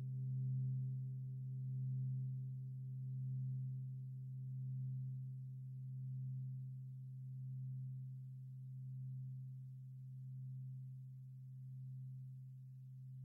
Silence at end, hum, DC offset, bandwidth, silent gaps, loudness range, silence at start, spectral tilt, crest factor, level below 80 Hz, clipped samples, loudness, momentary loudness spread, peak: 0 s; none; under 0.1%; 0.5 kHz; none; 7 LU; 0 s; -12 dB/octave; 10 dB; -84 dBFS; under 0.1%; -48 LUFS; 11 LU; -36 dBFS